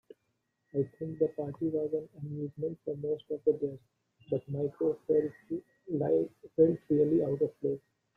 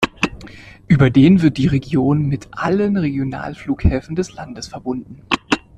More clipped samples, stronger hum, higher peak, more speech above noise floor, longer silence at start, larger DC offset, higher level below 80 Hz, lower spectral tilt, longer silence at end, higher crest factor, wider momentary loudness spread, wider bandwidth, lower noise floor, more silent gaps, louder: neither; neither; second, -12 dBFS vs 0 dBFS; first, 48 dB vs 22 dB; first, 0.75 s vs 0 s; neither; second, -70 dBFS vs -34 dBFS; first, -11 dB/octave vs -7 dB/octave; first, 0.4 s vs 0.2 s; about the same, 20 dB vs 16 dB; second, 12 LU vs 16 LU; second, 3.6 kHz vs 10.5 kHz; first, -80 dBFS vs -38 dBFS; neither; second, -32 LUFS vs -17 LUFS